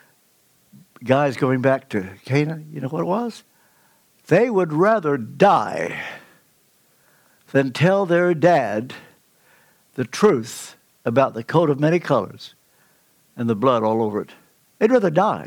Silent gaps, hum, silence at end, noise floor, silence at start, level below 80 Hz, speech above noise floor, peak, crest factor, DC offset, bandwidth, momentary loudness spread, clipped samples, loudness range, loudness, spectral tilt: none; none; 0 s; -60 dBFS; 1 s; -66 dBFS; 41 dB; -2 dBFS; 20 dB; under 0.1%; 19 kHz; 16 LU; under 0.1%; 2 LU; -20 LUFS; -6.5 dB/octave